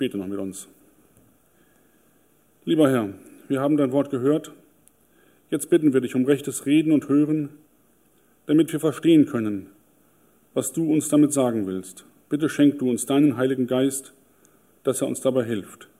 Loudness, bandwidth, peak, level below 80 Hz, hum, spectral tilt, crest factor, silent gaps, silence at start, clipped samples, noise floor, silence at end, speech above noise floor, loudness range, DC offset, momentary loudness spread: -22 LUFS; 15.5 kHz; -6 dBFS; -72 dBFS; 50 Hz at -55 dBFS; -5.5 dB/octave; 18 dB; none; 0 s; under 0.1%; -61 dBFS; 0.15 s; 40 dB; 3 LU; under 0.1%; 12 LU